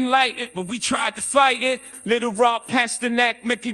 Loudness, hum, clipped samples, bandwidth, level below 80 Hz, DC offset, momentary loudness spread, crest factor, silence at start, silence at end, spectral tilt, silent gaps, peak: -21 LUFS; none; under 0.1%; 12.5 kHz; -62 dBFS; under 0.1%; 8 LU; 18 dB; 0 s; 0 s; -2 dB/octave; none; -4 dBFS